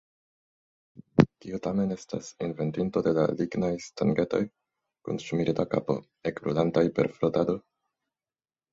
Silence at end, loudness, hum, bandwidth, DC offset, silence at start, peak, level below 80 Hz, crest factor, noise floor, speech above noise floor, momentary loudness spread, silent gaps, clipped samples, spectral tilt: 1.15 s; -28 LUFS; none; 8 kHz; under 0.1%; 0.95 s; -2 dBFS; -60 dBFS; 26 dB; under -90 dBFS; over 62 dB; 11 LU; none; under 0.1%; -7.5 dB/octave